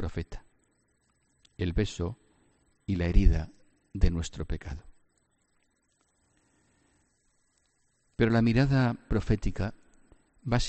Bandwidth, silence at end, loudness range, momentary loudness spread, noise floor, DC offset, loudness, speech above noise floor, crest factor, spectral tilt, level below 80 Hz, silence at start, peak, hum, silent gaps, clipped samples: 8.4 kHz; 0 s; 8 LU; 20 LU; -73 dBFS; under 0.1%; -29 LUFS; 46 dB; 22 dB; -7 dB/octave; -36 dBFS; 0 s; -8 dBFS; none; none; under 0.1%